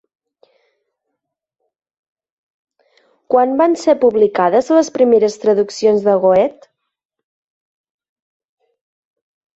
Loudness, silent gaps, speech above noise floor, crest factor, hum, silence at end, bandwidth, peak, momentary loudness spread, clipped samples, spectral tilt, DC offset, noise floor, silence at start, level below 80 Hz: -14 LUFS; none; 65 dB; 16 dB; none; 3.05 s; 8 kHz; -2 dBFS; 3 LU; under 0.1%; -5.5 dB/octave; under 0.1%; -78 dBFS; 3.3 s; -62 dBFS